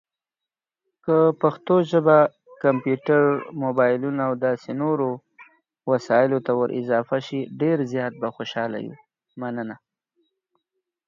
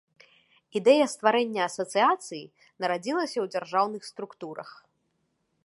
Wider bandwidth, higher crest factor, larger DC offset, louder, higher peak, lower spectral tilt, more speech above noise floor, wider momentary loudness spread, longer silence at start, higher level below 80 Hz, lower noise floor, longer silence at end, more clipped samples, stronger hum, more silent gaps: second, 7.4 kHz vs 11.5 kHz; about the same, 18 dB vs 22 dB; neither; first, -22 LUFS vs -26 LUFS; about the same, -4 dBFS vs -6 dBFS; first, -8 dB/octave vs -3.5 dB/octave; first, 68 dB vs 48 dB; second, 13 LU vs 18 LU; first, 1.05 s vs 0.75 s; first, -72 dBFS vs -84 dBFS; first, -89 dBFS vs -75 dBFS; first, 1.3 s vs 0.95 s; neither; neither; neither